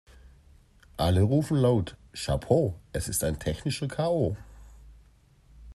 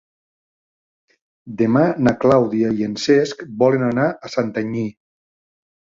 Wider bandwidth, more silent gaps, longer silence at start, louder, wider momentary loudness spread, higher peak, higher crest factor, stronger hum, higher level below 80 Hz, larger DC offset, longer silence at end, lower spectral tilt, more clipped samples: first, 13.5 kHz vs 7.8 kHz; neither; second, 1 s vs 1.45 s; second, -27 LUFS vs -18 LUFS; about the same, 11 LU vs 9 LU; second, -8 dBFS vs -2 dBFS; about the same, 20 dB vs 18 dB; neither; first, -46 dBFS vs -54 dBFS; neither; second, 0.05 s vs 1.05 s; about the same, -6 dB/octave vs -6.5 dB/octave; neither